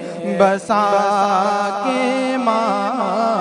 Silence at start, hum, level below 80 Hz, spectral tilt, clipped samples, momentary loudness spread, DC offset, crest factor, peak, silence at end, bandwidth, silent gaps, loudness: 0 s; none; -66 dBFS; -5 dB/octave; under 0.1%; 4 LU; under 0.1%; 16 dB; 0 dBFS; 0 s; 11 kHz; none; -17 LUFS